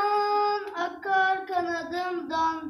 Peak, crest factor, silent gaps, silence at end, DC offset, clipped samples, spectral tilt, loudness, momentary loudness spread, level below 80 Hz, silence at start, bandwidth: -14 dBFS; 14 dB; none; 0 s; under 0.1%; under 0.1%; -3.5 dB/octave; -27 LUFS; 7 LU; -68 dBFS; 0 s; 13 kHz